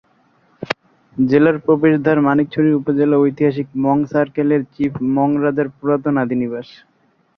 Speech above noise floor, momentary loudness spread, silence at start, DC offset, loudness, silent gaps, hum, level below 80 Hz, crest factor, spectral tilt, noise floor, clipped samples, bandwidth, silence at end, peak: 41 dB; 12 LU; 0.6 s; under 0.1%; -17 LUFS; none; none; -56 dBFS; 16 dB; -9 dB/octave; -57 dBFS; under 0.1%; 6.2 kHz; 0.75 s; -2 dBFS